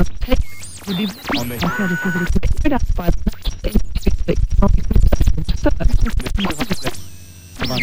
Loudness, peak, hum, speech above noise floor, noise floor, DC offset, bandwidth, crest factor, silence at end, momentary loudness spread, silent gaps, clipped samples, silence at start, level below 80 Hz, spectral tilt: -21 LUFS; -2 dBFS; none; 18 dB; -36 dBFS; 7%; 16 kHz; 14 dB; 0 s; 9 LU; none; under 0.1%; 0 s; -20 dBFS; -5.5 dB/octave